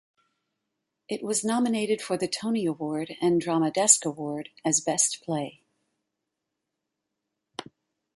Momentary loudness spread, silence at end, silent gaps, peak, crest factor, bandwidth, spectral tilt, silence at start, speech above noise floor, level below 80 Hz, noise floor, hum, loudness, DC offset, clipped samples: 16 LU; 0.55 s; none; -2 dBFS; 28 dB; 11.5 kHz; -3 dB/octave; 1.1 s; 58 dB; -74 dBFS; -84 dBFS; none; -25 LUFS; under 0.1%; under 0.1%